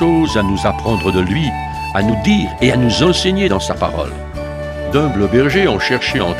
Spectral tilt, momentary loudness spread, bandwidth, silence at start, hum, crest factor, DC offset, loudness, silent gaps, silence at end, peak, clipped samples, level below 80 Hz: -5.5 dB/octave; 10 LU; 15 kHz; 0 s; none; 14 dB; under 0.1%; -15 LUFS; none; 0 s; 0 dBFS; under 0.1%; -30 dBFS